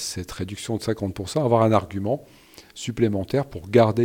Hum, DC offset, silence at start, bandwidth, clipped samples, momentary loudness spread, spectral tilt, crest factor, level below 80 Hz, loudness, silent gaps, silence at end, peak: none; under 0.1%; 0 s; 17 kHz; under 0.1%; 13 LU; -6 dB/octave; 20 dB; -50 dBFS; -24 LUFS; none; 0 s; -2 dBFS